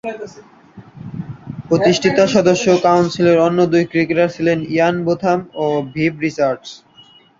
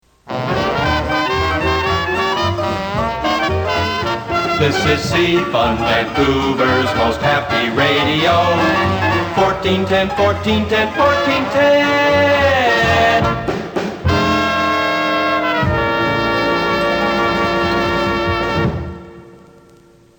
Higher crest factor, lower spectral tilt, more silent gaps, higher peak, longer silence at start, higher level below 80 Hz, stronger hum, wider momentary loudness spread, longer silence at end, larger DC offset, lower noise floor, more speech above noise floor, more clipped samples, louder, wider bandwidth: about the same, 16 dB vs 14 dB; about the same, -6 dB/octave vs -5.5 dB/octave; neither; about the same, 0 dBFS vs -2 dBFS; second, 0.05 s vs 0.25 s; second, -54 dBFS vs -34 dBFS; neither; first, 17 LU vs 6 LU; second, 0.65 s vs 0.8 s; neither; about the same, -47 dBFS vs -47 dBFS; about the same, 32 dB vs 32 dB; neither; about the same, -15 LUFS vs -15 LUFS; second, 7.6 kHz vs over 20 kHz